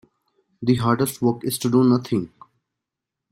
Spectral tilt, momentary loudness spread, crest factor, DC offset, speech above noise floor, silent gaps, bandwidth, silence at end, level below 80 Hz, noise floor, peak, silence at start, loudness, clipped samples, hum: -6.5 dB/octave; 9 LU; 18 dB; under 0.1%; 65 dB; none; 16 kHz; 1.05 s; -58 dBFS; -85 dBFS; -6 dBFS; 0.6 s; -21 LUFS; under 0.1%; none